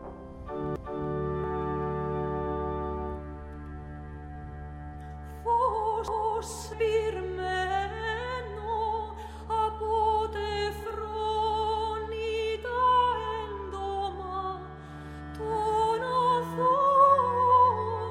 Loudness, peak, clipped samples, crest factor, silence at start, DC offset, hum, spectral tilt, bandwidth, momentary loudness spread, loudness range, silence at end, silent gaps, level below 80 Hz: -28 LUFS; -10 dBFS; under 0.1%; 18 dB; 0 s; under 0.1%; none; -5.5 dB/octave; 15.5 kHz; 19 LU; 8 LU; 0 s; none; -44 dBFS